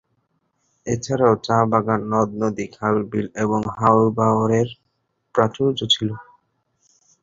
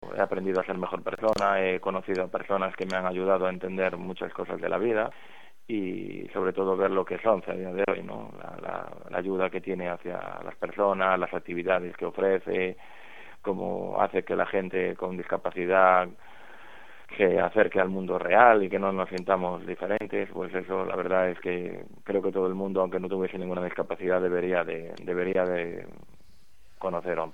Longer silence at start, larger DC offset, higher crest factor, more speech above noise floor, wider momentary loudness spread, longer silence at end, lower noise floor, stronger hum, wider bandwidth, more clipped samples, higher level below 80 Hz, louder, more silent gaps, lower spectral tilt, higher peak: first, 0.85 s vs 0 s; second, under 0.1% vs 0.6%; about the same, 20 dB vs 24 dB; first, 52 dB vs 34 dB; second, 9 LU vs 12 LU; first, 1 s vs 0.05 s; first, -71 dBFS vs -61 dBFS; neither; second, 7.6 kHz vs 10 kHz; neither; first, -54 dBFS vs -64 dBFS; first, -20 LUFS vs -28 LUFS; neither; about the same, -6 dB/octave vs -7 dB/octave; about the same, -2 dBFS vs -4 dBFS